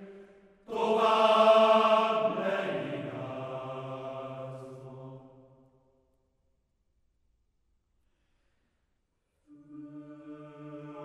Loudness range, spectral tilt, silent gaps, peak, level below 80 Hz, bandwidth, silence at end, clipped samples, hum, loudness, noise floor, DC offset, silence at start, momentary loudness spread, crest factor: 24 LU; -5.5 dB/octave; none; -10 dBFS; -76 dBFS; 9.8 kHz; 0 s; under 0.1%; none; -27 LUFS; -77 dBFS; under 0.1%; 0 s; 26 LU; 22 dB